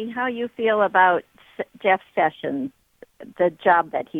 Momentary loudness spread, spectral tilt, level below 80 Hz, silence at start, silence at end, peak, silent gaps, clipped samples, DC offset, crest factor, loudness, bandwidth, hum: 12 LU; -7 dB/octave; -68 dBFS; 0 s; 0 s; -4 dBFS; none; under 0.1%; under 0.1%; 20 dB; -21 LUFS; 4.1 kHz; none